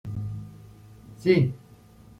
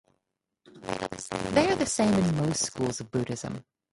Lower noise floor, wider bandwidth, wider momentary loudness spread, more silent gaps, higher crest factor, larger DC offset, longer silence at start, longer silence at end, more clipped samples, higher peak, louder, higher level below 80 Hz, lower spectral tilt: second, -51 dBFS vs -82 dBFS; about the same, 11.5 kHz vs 11.5 kHz; first, 22 LU vs 12 LU; neither; about the same, 22 dB vs 20 dB; neither; second, 0.05 s vs 0.75 s; first, 0.6 s vs 0.3 s; neither; about the same, -6 dBFS vs -8 dBFS; first, -25 LUFS vs -28 LUFS; about the same, -54 dBFS vs -54 dBFS; first, -8.5 dB/octave vs -4.5 dB/octave